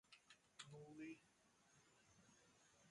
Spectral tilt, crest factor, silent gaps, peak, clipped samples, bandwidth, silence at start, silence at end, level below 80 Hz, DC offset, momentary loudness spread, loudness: -4 dB/octave; 24 dB; none; -40 dBFS; under 0.1%; 11 kHz; 0.05 s; 0 s; under -90 dBFS; under 0.1%; 10 LU; -61 LUFS